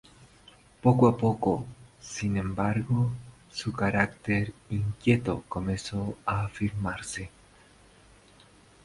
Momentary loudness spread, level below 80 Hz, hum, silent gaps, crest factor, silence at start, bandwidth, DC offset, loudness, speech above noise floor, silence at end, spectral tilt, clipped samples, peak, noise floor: 14 LU; -50 dBFS; 50 Hz at -45 dBFS; none; 22 dB; 0.85 s; 11.5 kHz; under 0.1%; -28 LUFS; 29 dB; 1.55 s; -6.5 dB/octave; under 0.1%; -8 dBFS; -57 dBFS